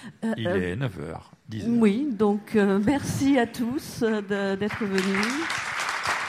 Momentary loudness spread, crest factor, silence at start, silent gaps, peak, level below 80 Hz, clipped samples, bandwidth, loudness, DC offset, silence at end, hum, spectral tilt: 9 LU; 16 dB; 0 s; none; -8 dBFS; -56 dBFS; under 0.1%; 15.5 kHz; -25 LUFS; under 0.1%; 0 s; none; -5.5 dB/octave